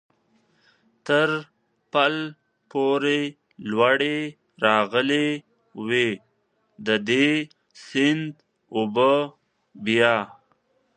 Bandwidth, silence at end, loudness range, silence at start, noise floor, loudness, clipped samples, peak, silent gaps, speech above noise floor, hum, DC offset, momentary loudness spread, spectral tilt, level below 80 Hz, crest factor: 9.6 kHz; 0.7 s; 2 LU; 1.05 s; -69 dBFS; -23 LUFS; under 0.1%; -2 dBFS; none; 47 dB; none; under 0.1%; 15 LU; -5 dB/octave; -74 dBFS; 22 dB